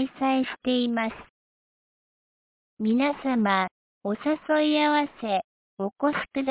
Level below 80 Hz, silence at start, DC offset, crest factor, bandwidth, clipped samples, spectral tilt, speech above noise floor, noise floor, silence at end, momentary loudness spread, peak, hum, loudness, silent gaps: -66 dBFS; 0 s; under 0.1%; 16 dB; 4 kHz; under 0.1%; -3 dB/octave; over 65 dB; under -90 dBFS; 0 s; 10 LU; -10 dBFS; none; -26 LUFS; 1.30-2.77 s, 3.71-4.01 s, 5.44-5.77 s